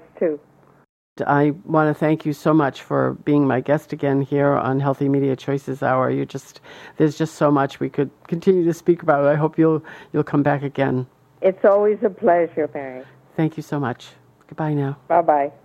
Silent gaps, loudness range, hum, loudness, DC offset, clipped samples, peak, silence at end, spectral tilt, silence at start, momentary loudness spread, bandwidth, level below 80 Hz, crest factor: 0.89-1.16 s; 3 LU; none; -20 LUFS; under 0.1%; under 0.1%; -2 dBFS; 0.15 s; -8 dB/octave; 0.2 s; 9 LU; 13.5 kHz; -62 dBFS; 18 dB